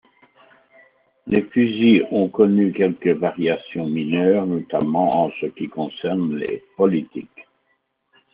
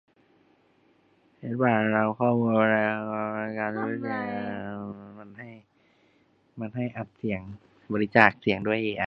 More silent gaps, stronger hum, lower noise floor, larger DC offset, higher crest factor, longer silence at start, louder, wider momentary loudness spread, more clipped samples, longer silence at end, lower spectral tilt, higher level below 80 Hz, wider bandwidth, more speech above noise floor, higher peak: neither; neither; first, -69 dBFS vs -65 dBFS; neither; second, 18 dB vs 28 dB; second, 1.25 s vs 1.4 s; first, -20 LUFS vs -26 LUFS; second, 11 LU vs 21 LU; neither; first, 0.9 s vs 0 s; second, -6 dB/octave vs -8.5 dB/octave; about the same, -62 dBFS vs -64 dBFS; second, 5 kHz vs 5.8 kHz; first, 50 dB vs 38 dB; about the same, -2 dBFS vs 0 dBFS